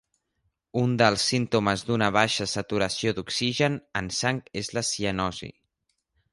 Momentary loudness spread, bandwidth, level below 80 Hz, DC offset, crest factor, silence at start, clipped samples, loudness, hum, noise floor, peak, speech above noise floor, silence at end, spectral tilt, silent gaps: 9 LU; 11.5 kHz; -54 dBFS; under 0.1%; 22 dB; 0.75 s; under 0.1%; -25 LUFS; none; -77 dBFS; -6 dBFS; 52 dB; 0.8 s; -4 dB/octave; none